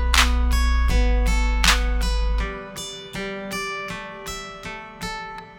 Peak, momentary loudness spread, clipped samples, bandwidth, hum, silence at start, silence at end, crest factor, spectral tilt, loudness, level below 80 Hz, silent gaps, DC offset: 0 dBFS; 14 LU; under 0.1%; 18 kHz; none; 0 s; 0 s; 22 dB; -3.5 dB/octave; -24 LUFS; -22 dBFS; none; under 0.1%